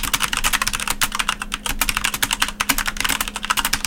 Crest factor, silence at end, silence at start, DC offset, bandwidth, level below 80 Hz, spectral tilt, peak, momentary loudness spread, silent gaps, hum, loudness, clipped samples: 18 dB; 0 s; 0 s; under 0.1%; 17.5 kHz; -32 dBFS; -0.5 dB/octave; -4 dBFS; 4 LU; none; none; -20 LUFS; under 0.1%